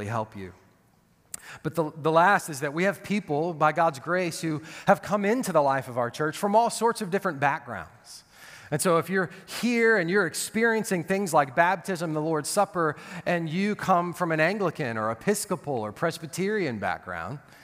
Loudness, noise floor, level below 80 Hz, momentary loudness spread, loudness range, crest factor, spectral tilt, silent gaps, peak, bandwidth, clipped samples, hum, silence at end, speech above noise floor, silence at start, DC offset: -26 LUFS; -63 dBFS; -66 dBFS; 12 LU; 3 LU; 22 dB; -5 dB/octave; none; -4 dBFS; 16 kHz; under 0.1%; none; 0.25 s; 37 dB; 0 s; under 0.1%